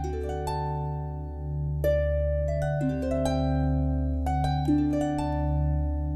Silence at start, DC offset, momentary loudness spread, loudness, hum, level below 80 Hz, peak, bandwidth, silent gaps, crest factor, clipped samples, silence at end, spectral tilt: 0 s; under 0.1%; 7 LU; -28 LUFS; none; -32 dBFS; -14 dBFS; 13.5 kHz; none; 12 dB; under 0.1%; 0 s; -8 dB/octave